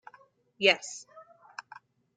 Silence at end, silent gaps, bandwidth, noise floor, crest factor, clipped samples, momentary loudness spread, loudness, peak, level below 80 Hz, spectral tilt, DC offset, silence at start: 0.95 s; none; 9.6 kHz; -61 dBFS; 26 dB; under 0.1%; 22 LU; -26 LUFS; -8 dBFS; -86 dBFS; -1.5 dB/octave; under 0.1%; 0.6 s